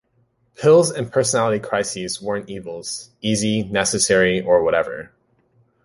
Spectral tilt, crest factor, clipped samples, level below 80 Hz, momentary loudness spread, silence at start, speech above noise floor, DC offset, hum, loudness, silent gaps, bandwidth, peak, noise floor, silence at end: -4 dB/octave; 18 dB; under 0.1%; -52 dBFS; 14 LU; 0.6 s; 44 dB; under 0.1%; none; -19 LUFS; none; 11.5 kHz; -2 dBFS; -64 dBFS; 0.8 s